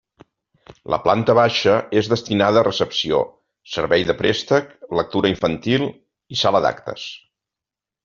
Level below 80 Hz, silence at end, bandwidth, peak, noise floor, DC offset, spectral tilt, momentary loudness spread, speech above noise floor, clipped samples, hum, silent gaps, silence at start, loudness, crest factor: -52 dBFS; 0.85 s; 7.4 kHz; -2 dBFS; -88 dBFS; under 0.1%; -3.5 dB/octave; 12 LU; 69 dB; under 0.1%; none; none; 0.9 s; -19 LUFS; 18 dB